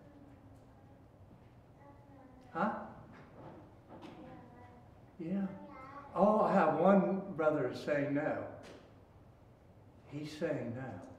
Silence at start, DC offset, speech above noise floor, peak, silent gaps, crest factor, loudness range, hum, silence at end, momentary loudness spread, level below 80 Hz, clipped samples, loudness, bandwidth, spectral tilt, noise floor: 0.05 s; under 0.1%; 27 dB; -14 dBFS; none; 22 dB; 13 LU; none; 0 s; 26 LU; -68 dBFS; under 0.1%; -34 LUFS; 9.6 kHz; -8 dB/octave; -60 dBFS